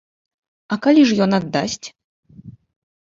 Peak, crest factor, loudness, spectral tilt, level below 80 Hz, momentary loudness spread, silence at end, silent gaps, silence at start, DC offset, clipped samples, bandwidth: -4 dBFS; 16 dB; -17 LUFS; -5.5 dB/octave; -58 dBFS; 15 LU; 0.55 s; 2.04-2.23 s; 0.7 s; under 0.1%; under 0.1%; 7.8 kHz